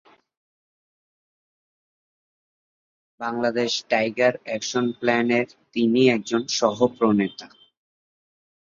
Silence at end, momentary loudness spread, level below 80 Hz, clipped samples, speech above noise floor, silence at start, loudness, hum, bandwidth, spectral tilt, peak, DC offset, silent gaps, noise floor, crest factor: 1.3 s; 10 LU; -68 dBFS; under 0.1%; over 68 dB; 3.2 s; -22 LUFS; none; 7.6 kHz; -4.5 dB/octave; -4 dBFS; under 0.1%; none; under -90 dBFS; 20 dB